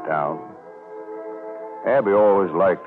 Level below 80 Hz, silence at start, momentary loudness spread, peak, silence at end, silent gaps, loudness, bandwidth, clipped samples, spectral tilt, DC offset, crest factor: -70 dBFS; 0 s; 22 LU; -8 dBFS; 0 s; none; -19 LUFS; 4 kHz; under 0.1%; -9.5 dB/octave; under 0.1%; 14 dB